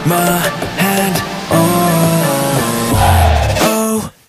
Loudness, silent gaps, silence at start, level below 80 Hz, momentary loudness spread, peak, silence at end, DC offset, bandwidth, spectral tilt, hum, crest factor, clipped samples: -13 LUFS; none; 0 s; -24 dBFS; 5 LU; 0 dBFS; 0.2 s; under 0.1%; 15.5 kHz; -4.5 dB/octave; none; 12 dB; under 0.1%